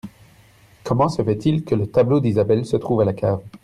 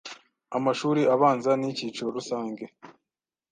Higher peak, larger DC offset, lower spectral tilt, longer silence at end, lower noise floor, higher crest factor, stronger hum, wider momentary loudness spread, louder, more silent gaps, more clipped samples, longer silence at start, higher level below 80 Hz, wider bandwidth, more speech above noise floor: first, -4 dBFS vs -8 dBFS; neither; first, -8.5 dB/octave vs -5.5 dB/octave; second, 0.05 s vs 0.65 s; second, -51 dBFS vs -89 dBFS; about the same, 16 dB vs 20 dB; neither; second, 6 LU vs 17 LU; first, -20 LUFS vs -26 LUFS; neither; neither; about the same, 0.05 s vs 0.05 s; first, -50 dBFS vs -76 dBFS; first, 12 kHz vs 9.6 kHz; second, 32 dB vs 64 dB